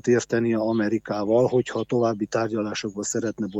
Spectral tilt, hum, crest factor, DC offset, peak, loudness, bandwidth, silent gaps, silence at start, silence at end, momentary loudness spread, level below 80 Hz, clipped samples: -5.5 dB/octave; none; 16 dB; under 0.1%; -8 dBFS; -24 LUFS; 8.4 kHz; none; 0.05 s; 0 s; 6 LU; -62 dBFS; under 0.1%